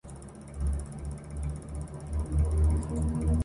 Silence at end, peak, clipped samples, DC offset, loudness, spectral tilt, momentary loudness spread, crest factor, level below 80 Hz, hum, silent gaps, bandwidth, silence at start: 0 s; -16 dBFS; under 0.1%; under 0.1%; -32 LUFS; -8 dB/octave; 13 LU; 14 dB; -32 dBFS; none; none; 11.5 kHz; 0.05 s